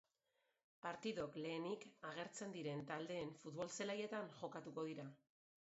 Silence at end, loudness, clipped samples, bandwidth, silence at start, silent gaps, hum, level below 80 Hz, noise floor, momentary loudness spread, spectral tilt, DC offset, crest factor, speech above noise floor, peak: 0.45 s; -49 LUFS; under 0.1%; 7.6 kHz; 0.85 s; none; none; -86 dBFS; -87 dBFS; 6 LU; -4 dB/octave; under 0.1%; 20 dB; 38 dB; -30 dBFS